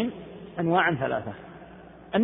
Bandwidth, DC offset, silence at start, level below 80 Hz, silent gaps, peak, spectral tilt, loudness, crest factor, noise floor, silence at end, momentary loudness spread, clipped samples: 3.9 kHz; under 0.1%; 0 s; -58 dBFS; none; -8 dBFS; -10.5 dB/octave; -26 LUFS; 20 dB; -47 dBFS; 0 s; 23 LU; under 0.1%